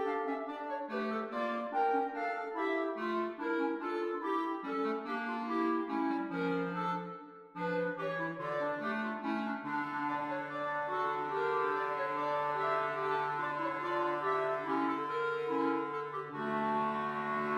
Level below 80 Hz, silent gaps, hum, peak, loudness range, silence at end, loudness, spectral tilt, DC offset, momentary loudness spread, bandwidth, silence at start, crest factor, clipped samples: -82 dBFS; none; none; -20 dBFS; 2 LU; 0 s; -35 LUFS; -7 dB/octave; under 0.1%; 4 LU; 11 kHz; 0 s; 14 dB; under 0.1%